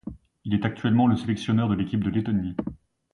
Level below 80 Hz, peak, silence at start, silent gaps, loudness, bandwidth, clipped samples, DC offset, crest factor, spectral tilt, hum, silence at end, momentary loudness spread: -48 dBFS; -10 dBFS; 0.05 s; none; -25 LUFS; 10.5 kHz; under 0.1%; under 0.1%; 16 dB; -8 dB/octave; none; 0.4 s; 14 LU